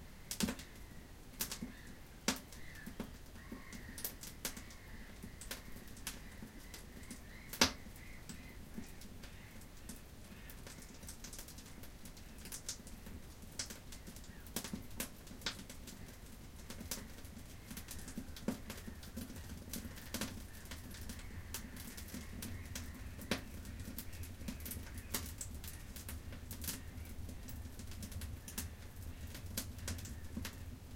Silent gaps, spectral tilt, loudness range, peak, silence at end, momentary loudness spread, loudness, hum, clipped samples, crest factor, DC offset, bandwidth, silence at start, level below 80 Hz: none; -3 dB/octave; 8 LU; -12 dBFS; 0 s; 11 LU; -46 LUFS; none; under 0.1%; 34 dB; under 0.1%; 17 kHz; 0 s; -54 dBFS